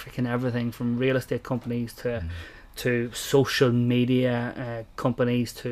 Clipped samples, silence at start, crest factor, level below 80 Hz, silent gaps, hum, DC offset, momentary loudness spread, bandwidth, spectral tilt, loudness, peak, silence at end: under 0.1%; 0 s; 18 dB; -50 dBFS; none; none; under 0.1%; 11 LU; 15.5 kHz; -6 dB/octave; -26 LUFS; -8 dBFS; 0 s